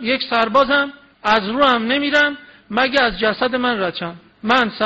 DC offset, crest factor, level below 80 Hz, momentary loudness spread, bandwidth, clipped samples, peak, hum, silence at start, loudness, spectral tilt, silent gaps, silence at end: under 0.1%; 14 dB; -48 dBFS; 11 LU; 8 kHz; under 0.1%; -4 dBFS; none; 0 s; -17 LUFS; -1 dB/octave; none; 0 s